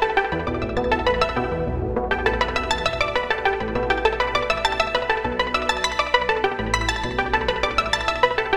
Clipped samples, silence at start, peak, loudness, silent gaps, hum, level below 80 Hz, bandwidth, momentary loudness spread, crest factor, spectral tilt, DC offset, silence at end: under 0.1%; 0 s; -2 dBFS; -22 LUFS; none; none; -34 dBFS; 16 kHz; 4 LU; 20 dB; -4 dB/octave; 0.2%; 0 s